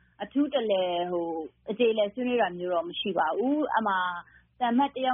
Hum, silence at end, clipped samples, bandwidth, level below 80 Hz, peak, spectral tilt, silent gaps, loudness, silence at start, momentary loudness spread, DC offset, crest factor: none; 0 s; under 0.1%; 3.9 kHz; -68 dBFS; -12 dBFS; -0.5 dB/octave; none; -28 LUFS; 0.2 s; 7 LU; under 0.1%; 16 dB